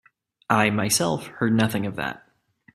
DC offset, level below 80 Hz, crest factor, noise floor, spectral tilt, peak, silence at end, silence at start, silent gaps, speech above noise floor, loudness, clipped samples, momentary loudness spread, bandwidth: under 0.1%; -58 dBFS; 24 dB; -60 dBFS; -4 dB/octave; -2 dBFS; 0.55 s; 0.5 s; none; 37 dB; -23 LUFS; under 0.1%; 11 LU; 14.5 kHz